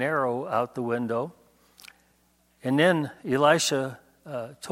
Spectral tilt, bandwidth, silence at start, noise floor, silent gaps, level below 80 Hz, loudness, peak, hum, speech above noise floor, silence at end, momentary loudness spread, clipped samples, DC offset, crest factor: -4.5 dB/octave; 16.5 kHz; 0 s; -65 dBFS; none; -70 dBFS; -26 LUFS; -6 dBFS; none; 40 dB; 0 s; 15 LU; under 0.1%; under 0.1%; 22 dB